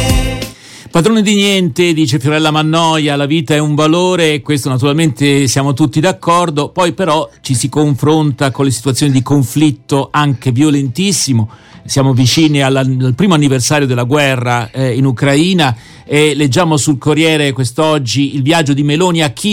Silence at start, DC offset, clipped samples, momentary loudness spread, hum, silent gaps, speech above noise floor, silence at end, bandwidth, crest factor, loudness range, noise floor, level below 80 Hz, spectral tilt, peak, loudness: 0 s; under 0.1%; under 0.1%; 5 LU; none; none; 21 dB; 0 s; 16.5 kHz; 12 dB; 1 LU; -32 dBFS; -32 dBFS; -5 dB/octave; 0 dBFS; -12 LUFS